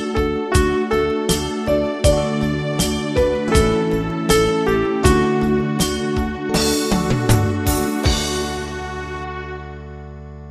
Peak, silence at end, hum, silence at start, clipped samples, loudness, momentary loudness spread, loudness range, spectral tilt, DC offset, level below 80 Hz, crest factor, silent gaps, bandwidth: 0 dBFS; 0 s; none; 0 s; under 0.1%; -19 LUFS; 12 LU; 3 LU; -5 dB/octave; under 0.1%; -28 dBFS; 18 dB; none; 15.5 kHz